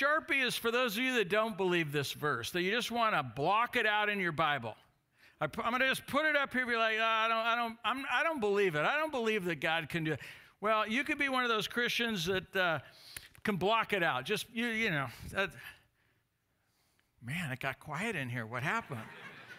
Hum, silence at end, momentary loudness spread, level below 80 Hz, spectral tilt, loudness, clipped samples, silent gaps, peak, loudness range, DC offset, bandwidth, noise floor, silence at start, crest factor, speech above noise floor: none; 0 s; 9 LU; -66 dBFS; -4 dB/octave; -32 LUFS; under 0.1%; none; -16 dBFS; 8 LU; under 0.1%; 16 kHz; -78 dBFS; 0 s; 18 dB; 45 dB